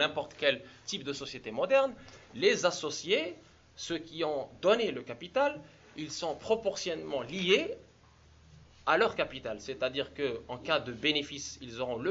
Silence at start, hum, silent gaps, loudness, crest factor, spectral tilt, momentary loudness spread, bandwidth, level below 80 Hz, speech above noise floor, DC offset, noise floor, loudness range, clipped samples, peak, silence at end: 0 s; none; none; -32 LUFS; 22 dB; -3 dB/octave; 13 LU; 8 kHz; -64 dBFS; 28 dB; under 0.1%; -60 dBFS; 2 LU; under 0.1%; -12 dBFS; 0 s